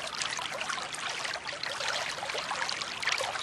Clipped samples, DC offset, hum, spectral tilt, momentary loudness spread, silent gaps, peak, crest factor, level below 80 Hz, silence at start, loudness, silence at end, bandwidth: under 0.1%; under 0.1%; none; 0 dB/octave; 4 LU; none; -12 dBFS; 22 dB; -68 dBFS; 0 s; -32 LUFS; 0 s; 13 kHz